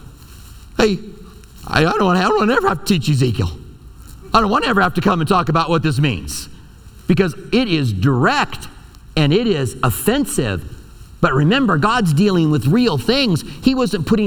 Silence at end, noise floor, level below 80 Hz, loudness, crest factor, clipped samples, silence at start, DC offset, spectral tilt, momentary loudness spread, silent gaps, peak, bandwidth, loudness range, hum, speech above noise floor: 0 s; -40 dBFS; -36 dBFS; -16 LUFS; 16 dB; under 0.1%; 0.05 s; under 0.1%; -5.5 dB/octave; 11 LU; none; 0 dBFS; 19 kHz; 2 LU; none; 24 dB